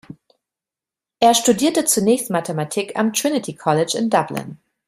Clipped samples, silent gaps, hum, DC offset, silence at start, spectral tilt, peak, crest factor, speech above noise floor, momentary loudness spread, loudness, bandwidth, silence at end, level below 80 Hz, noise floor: under 0.1%; none; none; under 0.1%; 0.1 s; -3.5 dB/octave; -2 dBFS; 18 dB; 70 dB; 8 LU; -18 LUFS; 16 kHz; 0.3 s; -62 dBFS; -89 dBFS